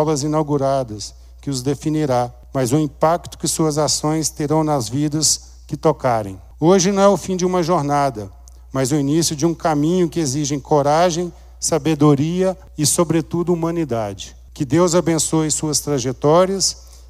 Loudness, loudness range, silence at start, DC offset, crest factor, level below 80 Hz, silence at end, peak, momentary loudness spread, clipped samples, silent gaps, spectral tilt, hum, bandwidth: -18 LUFS; 2 LU; 0 s; under 0.1%; 16 dB; -42 dBFS; 0 s; -2 dBFS; 9 LU; under 0.1%; none; -5 dB/octave; none; 16 kHz